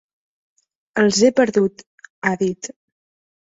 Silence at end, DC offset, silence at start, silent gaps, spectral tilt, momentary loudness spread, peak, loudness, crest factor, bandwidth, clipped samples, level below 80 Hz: 0.75 s; under 0.1%; 0.95 s; 1.86-1.98 s, 2.10-2.22 s; -4.5 dB/octave; 14 LU; -2 dBFS; -18 LUFS; 18 dB; 8 kHz; under 0.1%; -60 dBFS